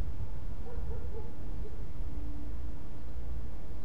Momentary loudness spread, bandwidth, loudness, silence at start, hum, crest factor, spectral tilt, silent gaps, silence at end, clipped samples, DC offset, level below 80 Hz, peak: 4 LU; 11.5 kHz; -43 LUFS; 0 s; none; 14 dB; -8 dB/octave; none; 0 s; under 0.1%; 5%; -40 dBFS; -20 dBFS